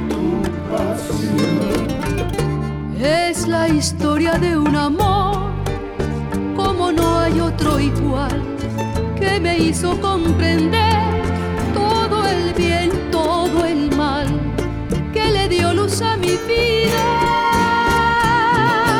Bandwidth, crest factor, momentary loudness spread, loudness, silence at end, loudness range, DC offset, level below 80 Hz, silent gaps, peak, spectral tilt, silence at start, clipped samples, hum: 19 kHz; 12 dB; 7 LU; -18 LUFS; 0 s; 3 LU; under 0.1%; -30 dBFS; none; -6 dBFS; -5.5 dB/octave; 0 s; under 0.1%; none